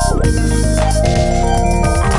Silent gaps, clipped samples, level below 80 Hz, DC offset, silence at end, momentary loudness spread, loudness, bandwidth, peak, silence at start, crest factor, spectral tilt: none; under 0.1%; -16 dBFS; under 0.1%; 0 s; 1 LU; -15 LUFS; 11.5 kHz; 0 dBFS; 0 s; 12 dB; -5.5 dB/octave